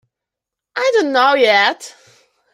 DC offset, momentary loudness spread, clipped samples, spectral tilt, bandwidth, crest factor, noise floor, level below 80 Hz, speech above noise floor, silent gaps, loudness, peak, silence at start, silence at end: under 0.1%; 14 LU; under 0.1%; -2 dB/octave; 15 kHz; 16 dB; -84 dBFS; -70 dBFS; 70 dB; none; -14 LUFS; -2 dBFS; 0.75 s; 0.65 s